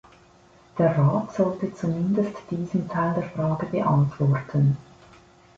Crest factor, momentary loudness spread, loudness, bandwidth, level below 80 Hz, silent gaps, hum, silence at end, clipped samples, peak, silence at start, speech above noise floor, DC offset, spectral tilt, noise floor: 16 dB; 7 LU; -24 LUFS; 7.4 kHz; -56 dBFS; none; none; 0.75 s; under 0.1%; -8 dBFS; 0.75 s; 31 dB; under 0.1%; -9.5 dB/octave; -54 dBFS